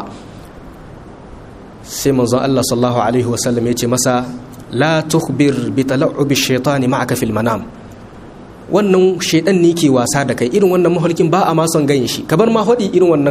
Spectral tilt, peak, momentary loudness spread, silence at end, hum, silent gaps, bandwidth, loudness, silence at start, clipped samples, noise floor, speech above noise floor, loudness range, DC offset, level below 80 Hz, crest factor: -5 dB/octave; 0 dBFS; 7 LU; 0 s; none; none; 15.5 kHz; -14 LUFS; 0 s; under 0.1%; -35 dBFS; 21 dB; 4 LU; under 0.1%; -44 dBFS; 14 dB